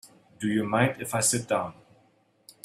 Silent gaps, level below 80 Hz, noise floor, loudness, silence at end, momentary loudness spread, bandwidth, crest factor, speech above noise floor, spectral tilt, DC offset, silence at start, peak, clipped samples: none; -64 dBFS; -65 dBFS; -26 LUFS; 0.9 s; 8 LU; 16 kHz; 20 dB; 38 dB; -4 dB/octave; under 0.1%; 0.05 s; -8 dBFS; under 0.1%